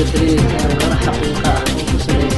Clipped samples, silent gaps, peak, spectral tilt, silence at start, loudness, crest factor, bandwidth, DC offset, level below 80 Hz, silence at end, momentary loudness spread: under 0.1%; none; -2 dBFS; -5.5 dB/octave; 0 s; -16 LUFS; 14 dB; 12.5 kHz; under 0.1%; -22 dBFS; 0 s; 3 LU